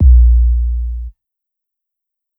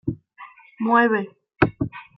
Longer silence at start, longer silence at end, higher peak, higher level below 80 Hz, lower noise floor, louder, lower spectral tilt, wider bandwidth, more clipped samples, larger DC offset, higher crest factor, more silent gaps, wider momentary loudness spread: about the same, 0 s vs 0.05 s; first, 1.3 s vs 0.15 s; about the same, 0 dBFS vs -2 dBFS; first, -12 dBFS vs -50 dBFS; first, -80 dBFS vs -46 dBFS; first, -13 LUFS vs -21 LUFS; first, -12.5 dB/octave vs -10 dB/octave; second, 0.3 kHz vs 5.6 kHz; neither; neither; second, 12 dB vs 20 dB; neither; about the same, 19 LU vs 17 LU